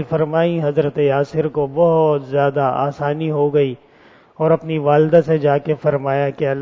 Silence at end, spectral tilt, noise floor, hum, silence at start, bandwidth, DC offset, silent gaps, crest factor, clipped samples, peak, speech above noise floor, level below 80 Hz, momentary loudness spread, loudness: 0 s; -9 dB/octave; -48 dBFS; none; 0 s; 7 kHz; under 0.1%; none; 16 dB; under 0.1%; -2 dBFS; 32 dB; -54 dBFS; 6 LU; -17 LUFS